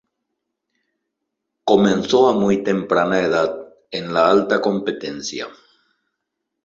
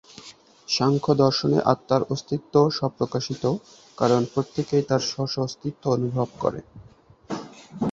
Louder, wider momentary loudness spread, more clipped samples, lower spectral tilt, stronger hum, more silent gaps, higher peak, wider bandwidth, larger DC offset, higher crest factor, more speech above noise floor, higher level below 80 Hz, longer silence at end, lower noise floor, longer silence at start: first, -18 LUFS vs -24 LUFS; about the same, 13 LU vs 15 LU; neither; about the same, -5.5 dB/octave vs -6 dB/octave; neither; neither; about the same, -2 dBFS vs -2 dBFS; about the same, 7.6 kHz vs 7.8 kHz; neither; about the same, 18 dB vs 22 dB; first, 61 dB vs 25 dB; about the same, -58 dBFS vs -58 dBFS; first, 1.15 s vs 0 s; first, -78 dBFS vs -48 dBFS; first, 1.65 s vs 0.2 s